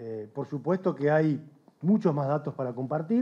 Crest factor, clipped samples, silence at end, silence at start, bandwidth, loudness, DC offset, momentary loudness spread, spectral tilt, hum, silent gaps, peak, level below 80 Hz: 16 dB; under 0.1%; 0 s; 0 s; 7 kHz; -28 LUFS; under 0.1%; 11 LU; -10 dB/octave; none; none; -12 dBFS; -84 dBFS